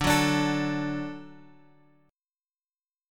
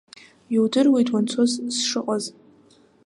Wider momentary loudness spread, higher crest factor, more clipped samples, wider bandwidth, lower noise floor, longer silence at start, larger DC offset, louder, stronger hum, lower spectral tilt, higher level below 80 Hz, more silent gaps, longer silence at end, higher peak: first, 15 LU vs 9 LU; first, 20 dB vs 14 dB; neither; first, 17.5 kHz vs 11.5 kHz; first, under -90 dBFS vs -55 dBFS; second, 0 s vs 0.5 s; neither; second, -27 LUFS vs -21 LUFS; neither; about the same, -4.5 dB/octave vs -4 dB/octave; first, -50 dBFS vs -74 dBFS; neither; first, 1.75 s vs 0.75 s; about the same, -10 dBFS vs -8 dBFS